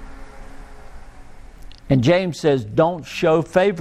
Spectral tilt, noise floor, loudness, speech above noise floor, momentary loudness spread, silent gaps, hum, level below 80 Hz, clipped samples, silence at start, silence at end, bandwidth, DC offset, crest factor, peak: -6.5 dB/octave; -39 dBFS; -19 LUFS; 21 dB; 4 LU; none; none; -42 dBFS; under 0.1%; 0 s; 0 s; 14 kHz; under 0.1%; 18 dB; -2 dBFS